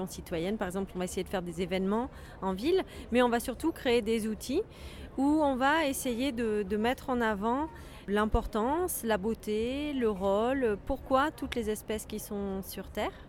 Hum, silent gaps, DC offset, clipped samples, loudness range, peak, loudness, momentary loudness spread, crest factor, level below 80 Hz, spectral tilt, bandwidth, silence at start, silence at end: none; none; under 0.1%; under 0.1%; 2 LU; -12 dBFS; -31 LUFS; 9 LU; 18 dB; -46 dBFS; -5 dB/octave; 17.5 kHz; 0 s; 0 s